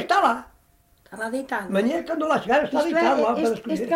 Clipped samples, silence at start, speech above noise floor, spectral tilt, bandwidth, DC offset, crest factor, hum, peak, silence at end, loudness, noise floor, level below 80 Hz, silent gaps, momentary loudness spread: under 0.1%; 0 s; 37 dB; -5 dB/octave; 16 kHz; under 0.1%; 16 dB; none; -8 dBFS; 0 s; -23 LUFS; -60 dBFS; -60 dBFS; none; 9 LU